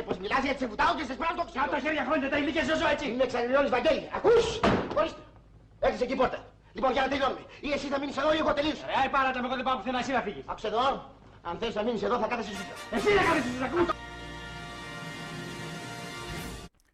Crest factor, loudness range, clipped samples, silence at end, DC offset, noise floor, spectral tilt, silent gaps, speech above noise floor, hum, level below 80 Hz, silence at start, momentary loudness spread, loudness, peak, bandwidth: 14 dB; 4 LU; under 0.1%; 0.25 s; under 0.1%; -54 dBFS; -4.5 dB/octave; none; 26 dB; none; -50 dBFS; 0 s; 13 LU; -29 LUFS; -16 dBFS; 15 kHz